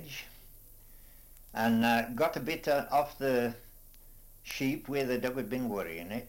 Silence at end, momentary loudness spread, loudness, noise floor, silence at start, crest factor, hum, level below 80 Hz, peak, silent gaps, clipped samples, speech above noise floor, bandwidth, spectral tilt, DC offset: 0 s; 15 LU; -32 LUFS; -54 dBFS; 0 s; 18 dB; none; -56 dBFS; -16 dBFS; none; under 0.1%; 22 dB; 17 kHz; -5 dB/octave; under 0.1%